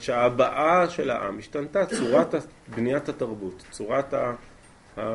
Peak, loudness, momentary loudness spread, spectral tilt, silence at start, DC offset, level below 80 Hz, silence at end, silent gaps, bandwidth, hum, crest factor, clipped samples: -8 dBFS; -25 LUFS; 16 LU; -5.5 dB/octave; 0 s; under 0.1%; -56 dBFS; 0 s; none; 11.5 kHz; none; 18 dB; under 0.1%